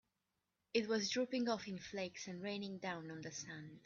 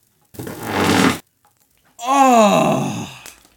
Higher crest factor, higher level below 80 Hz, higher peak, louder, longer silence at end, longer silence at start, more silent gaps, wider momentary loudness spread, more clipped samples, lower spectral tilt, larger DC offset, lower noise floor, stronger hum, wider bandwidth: about the same, 20 dB vs 18 dB; second, -80 dBFS vs -56 dBFS; second, -22 dBFS vs 0 dBFS; second, -42 LUFS vs -15 LUFS; second, 0.05 s vs 0.3 s; first, 0.75 s vs 0.4 s; neither; second, 10 LU vs 21 LU; neither; about the same, -3.5 dB/octave vs -4.5 dB/octave; neither; first, -88 dBFS vs -59 dBFS; neither; second, 7.2 kHz vs 18.5 kHz